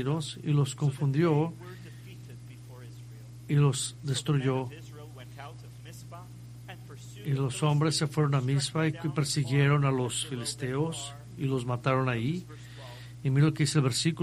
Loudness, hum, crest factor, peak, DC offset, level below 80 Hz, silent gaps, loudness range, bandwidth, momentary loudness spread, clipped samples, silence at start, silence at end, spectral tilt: -28 LUFS; none; 18 dB; -12 dBFS; under 0.1%; -60 dBFS; none; 7 LU; 13.5 kHz; 20 LU; under 0.1%; 0 s; 0 s; -5.5 dB/octave